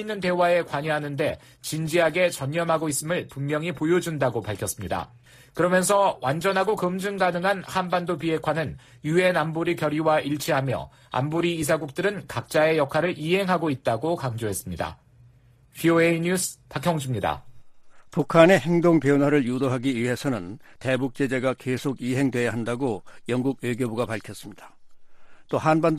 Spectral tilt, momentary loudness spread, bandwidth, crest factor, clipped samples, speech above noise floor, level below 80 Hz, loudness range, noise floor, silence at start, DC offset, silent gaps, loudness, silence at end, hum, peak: -5.5 dB/octave; 10 LU; 15 kHz; 22 dB; under 0.1%; 31 dB; -56 dBFS; 5 LU; -55 dBFS; 0 s; under 0.1%; none; -24 LUFS; 0 s; none; -2 dBFS